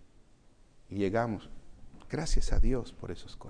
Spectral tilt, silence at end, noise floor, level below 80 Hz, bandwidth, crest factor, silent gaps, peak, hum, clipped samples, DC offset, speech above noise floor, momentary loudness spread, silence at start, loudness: -6 dB/octave; 0 s; -59 dBFS; -34 dBFS; 10 kHz; 16 dB; none; -14 dBFS; none; under 0.1%; under 0.1%; 31 dB; 13 LU; 0.9 s; -34 LUFS